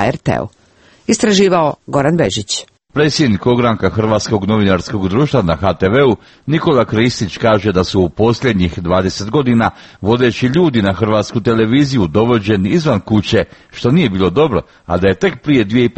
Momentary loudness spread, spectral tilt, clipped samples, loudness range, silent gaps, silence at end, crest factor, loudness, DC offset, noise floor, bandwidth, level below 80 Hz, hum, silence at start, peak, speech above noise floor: 6 LU; -6 dB/octave; under 0.1%; 1 LU; none; 0.05 s; 14 dB; -14 LUFS; under 0.1%; -48 dBFS; 8.8 kHz; -38 dBFS; none; 0 s; 0 dBFS; 35 dB